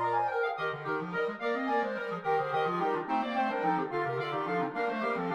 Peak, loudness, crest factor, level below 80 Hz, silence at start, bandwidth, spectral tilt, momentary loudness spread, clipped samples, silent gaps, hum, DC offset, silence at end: -18 dBFS; -31 LUFS; 12 dB; -74 dBFS; 0 s; 9.4 kHz; -7 dB/octave; 4 LU; under 0.1%; none; none; under 0.1%; 0 s